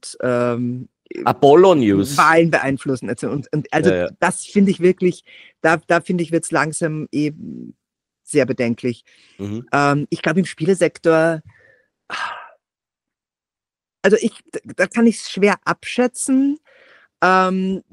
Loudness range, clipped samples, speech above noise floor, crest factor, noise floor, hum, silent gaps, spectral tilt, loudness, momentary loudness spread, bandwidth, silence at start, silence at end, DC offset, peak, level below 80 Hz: 7 LU; under 0.1%; over 73 dB; 18 dB; under -90 dBFS; none; none; -5.5 dB/octave; -17 LUFS; 15 LU; 15.5 kHz; 0.05 s; 0.1 s; under 0.1%; 0 dBFS; -60 dBFS